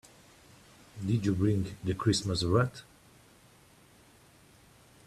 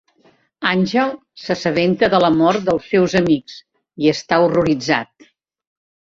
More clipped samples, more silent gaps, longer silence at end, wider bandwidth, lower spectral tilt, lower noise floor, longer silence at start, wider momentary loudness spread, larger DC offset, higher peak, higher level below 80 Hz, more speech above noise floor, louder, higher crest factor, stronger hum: neither; neither; first, 2.25 s vs 1.1 s; first, 13.5 kHz vs 7.6 kHz; about the same, -6 dB/octave vs -6 dB/octave; first, -60 dBFS vs -56 dBFS; first, 0.95 s vs 0.6 s; first, 11 LU vs 8 LU; neither; second, -14 dBFS vs -2 dBFS; second, -58 dBFS vs -52 dBFS; second, 31 dB vs 40 dB; second, -30 LUFS vs -17 LUFS; about the same, 20 dB vs 16 dB; neither